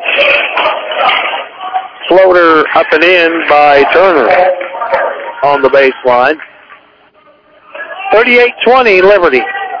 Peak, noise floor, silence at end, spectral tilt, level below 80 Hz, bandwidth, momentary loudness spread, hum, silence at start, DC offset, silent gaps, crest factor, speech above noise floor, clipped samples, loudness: 0 dBFS; -44 dBFS; 0 s; -5 dB/octave; -46 dBFS; 5.4 kHz; 12 LU; none; 0 s; under 0.1%; none; 8 dB; 38 dB; 3%; -8 LUFS